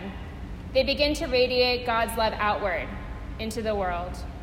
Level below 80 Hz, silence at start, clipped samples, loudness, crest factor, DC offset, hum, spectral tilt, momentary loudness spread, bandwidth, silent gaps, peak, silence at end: -38 dBFS; 0 s; under 0.1%; -26 LUFS; 18 dB; under 0.1%; none; -4.5 dB/octave; 15 LU; 16 kHz; none; -10 dBFS; 0 s